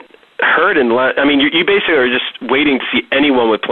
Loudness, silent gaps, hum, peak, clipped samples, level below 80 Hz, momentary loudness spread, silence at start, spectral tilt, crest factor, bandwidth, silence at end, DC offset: -12 LUFS; none; none; -4 dBFS; under 0.1%; -50 dBFS; 4 LU; 0.4 s; -7 dB/octave; 10 dB; 4.3 kHz; 0 s; 0.2%